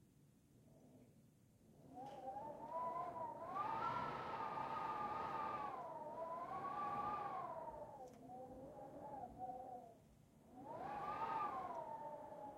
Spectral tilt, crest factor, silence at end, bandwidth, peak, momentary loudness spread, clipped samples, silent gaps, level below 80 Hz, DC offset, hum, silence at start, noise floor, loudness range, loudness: -6 dB/octave; 16 dB; 0 s; 16 kHz; -32 dBFS; 14 LU; under 0.1%; none; -78 dBFS; under 0.1%; none; 0 s; -71 dBFS; 7 LU; -48 LUFS